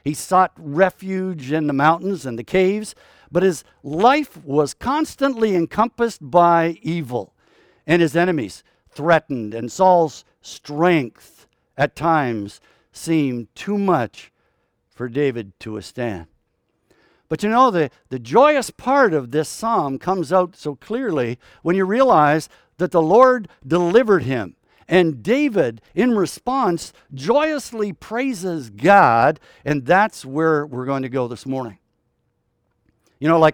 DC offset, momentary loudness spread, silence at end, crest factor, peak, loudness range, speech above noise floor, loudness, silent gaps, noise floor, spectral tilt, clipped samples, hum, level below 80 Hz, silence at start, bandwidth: under 0.1%; 14 LU; 0 s; 18 dB; 0 dBFS; 6 LU; 51 dB; -19 LUFS; none; -69 dBFS; -6 dB/octave; under 0.1%; none; -54 dBFS; 0.05 s; 18.5 kHz